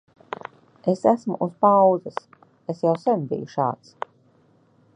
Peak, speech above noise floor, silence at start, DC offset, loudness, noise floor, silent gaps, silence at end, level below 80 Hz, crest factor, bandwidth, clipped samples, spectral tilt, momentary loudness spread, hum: -4 dBFS; 38 dB; 0.85 s; under 0.1%; -22 LUFS; -59 dBFS; none; 1.2 s; -72 dBFS; 20 dB; 9.6 kHz; under 0.1%; -8.5 dB/octave; 20 LU; none